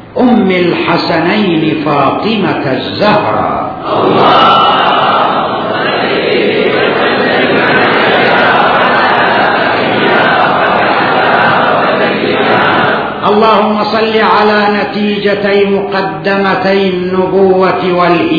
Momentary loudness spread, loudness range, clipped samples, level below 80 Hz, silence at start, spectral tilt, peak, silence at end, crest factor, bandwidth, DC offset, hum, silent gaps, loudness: 5 LU; 2 LU; 0.5%; -46 dBFS; 0 s; -7.5 dB/octave; 0 dBFS; 0 s; 10 dB; 5.4 kHz; 0.2%; none; none; -9 LUFS